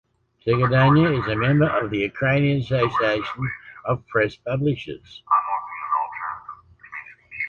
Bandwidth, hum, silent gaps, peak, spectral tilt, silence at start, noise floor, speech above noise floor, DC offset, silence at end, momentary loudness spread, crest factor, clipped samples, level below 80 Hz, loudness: 6.8 kHz; none; none; -6 dBFS; -8.5 dB/octave; 0.45 s; -43 dBFS; 22 dB; under 0.1%; 0 s; 19 LU; 16 dB; under 0.1%; -50 dBFS; -22 LUFS